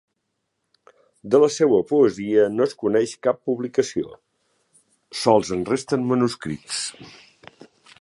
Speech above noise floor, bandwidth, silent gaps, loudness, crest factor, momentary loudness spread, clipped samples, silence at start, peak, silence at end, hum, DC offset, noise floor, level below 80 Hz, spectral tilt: 56 dB; 11.5 kHz; none; -21 LUFS; 20 dB; 10 LU; under 0.1%; 1.25 s; -2 dBFS; 0.9 s; none; under 0.1%; -76 dBFS; -60 dBFS; -5 dB/octave